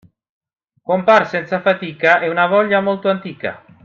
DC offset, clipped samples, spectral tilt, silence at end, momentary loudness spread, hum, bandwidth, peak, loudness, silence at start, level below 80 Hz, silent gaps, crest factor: under 0.1%; under 0.1%; -6.5 dB/octave; 0.25 s; 13 LU; none; 7.2 kHz; 0 dBFS; -16 LUFS; 0.9 s; -64 dBFS; none; 18 dB